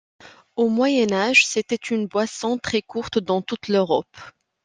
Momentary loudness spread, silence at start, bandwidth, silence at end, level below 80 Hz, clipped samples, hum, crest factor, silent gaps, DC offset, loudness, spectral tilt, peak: 9 LU; 0.25 s; 10 kHz; 0.35 s; -60 dBFS; under 0.1%; none; 20 dB; none; under 0.1%; -21 LUFS; -3.5 dB/octave; -2 dBFS